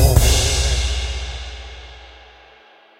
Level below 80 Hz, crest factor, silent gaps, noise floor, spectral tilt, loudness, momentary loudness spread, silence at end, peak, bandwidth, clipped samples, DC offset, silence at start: -22 dBFS; 18 dB; none; -49 dBFS; -3.5 dB/octave; -18 LUFS; 23 LU; 0.9 s; 0 dBFS; 16 kHz; under 0.1%; under 0.1%; 0 s